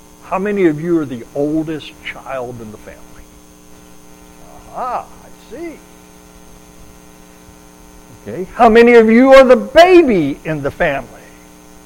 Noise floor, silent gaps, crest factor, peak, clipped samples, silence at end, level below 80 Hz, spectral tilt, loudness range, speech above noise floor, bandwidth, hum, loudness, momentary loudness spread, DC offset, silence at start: -41 dBFS; none; 14 dB; 0 dBFS; under 0.1%; 0.8 s; -40 dBFS; -6 dB/octave; 21 LU; 29 dB; 17 kHz; none; -11 LUFS; 23 LU; under 0.1%; 0.3 s